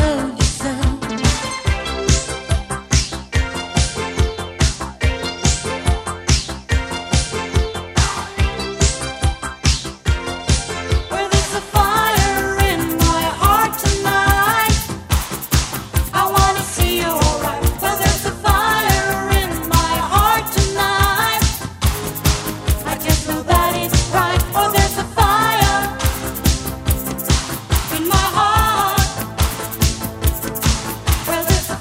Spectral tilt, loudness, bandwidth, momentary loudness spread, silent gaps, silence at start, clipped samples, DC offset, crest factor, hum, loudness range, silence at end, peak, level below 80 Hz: -4 dB/octave; -17 LUFS; 16.5 kHz; 7 LU; none; 0 s; under 0.1%; under 0.1%; 18 dB; none; 4 LU; 0 s; 0 dBFS; -24 dBFS